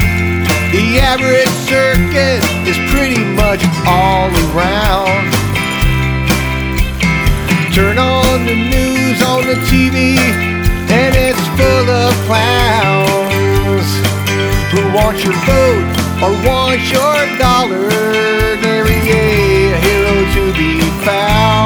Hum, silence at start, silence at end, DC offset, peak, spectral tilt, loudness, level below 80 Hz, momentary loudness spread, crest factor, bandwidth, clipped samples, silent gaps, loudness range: none; 0 s; 0 s; under 0.1%; 0 dBFS; -5 dB/octave; -11 LUFS; -22 dBFS; 3 LU; 12 dB; over 20 kHz; under 0.1%; none; 1 LU